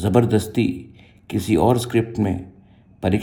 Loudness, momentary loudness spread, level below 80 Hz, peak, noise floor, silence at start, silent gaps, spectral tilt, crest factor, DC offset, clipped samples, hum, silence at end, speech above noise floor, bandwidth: -21 LUFS; 10 LU; -48 dBFS; -2 dBFS; -49 dBFS; 0 s; none; -7 dB/octave; 20 dB; under 0.1%; under 0.1%; none; 0 s; 30 dB; 18 kHz